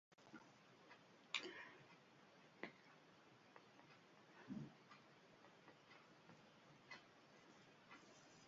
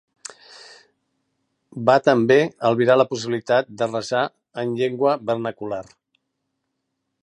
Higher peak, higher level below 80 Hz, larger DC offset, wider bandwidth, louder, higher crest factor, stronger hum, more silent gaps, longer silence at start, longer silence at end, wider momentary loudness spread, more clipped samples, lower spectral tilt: second, -26 dBFS vs -2 dBFS; second, under -90 dBFS vs -68 dBFS; neither; second, 7.4 kHz vs 11 kHz; second, -60 LUFS vs -20 LUFS; first, 36 dB vs 20 dB; neither; neither; second, 0.1 s vs 1.75 s; second, 0 s vs 1.4 s; second, 12 LU vs 15 LU; neither; second, -2 dB/octave vs -5.5 dB/octave